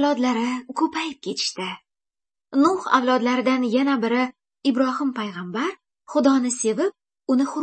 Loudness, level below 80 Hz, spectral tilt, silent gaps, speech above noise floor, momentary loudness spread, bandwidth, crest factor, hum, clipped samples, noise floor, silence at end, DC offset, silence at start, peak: -22 LUFS; -74 dBFS; -3.5 dB/octave; none; over 69 dB; 9 LU; 8.8 kHz; 18 dB; none; under 0.1%; under -90 dBFS; 0 s; under 0.1%; 0 s; -4 dBFS